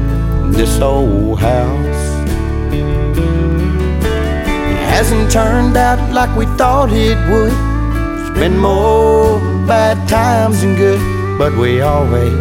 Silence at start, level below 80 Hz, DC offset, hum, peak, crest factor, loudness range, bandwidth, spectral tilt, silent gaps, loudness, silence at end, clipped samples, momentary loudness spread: 0 s; -18 dBFS; under 0.1%; none; 0 dBFS; 12 dB; 3 LU; 16.5 kHz; -6.5 dB/octave; none; -13 LUFS; 0 s; under 0.1%; 6 LU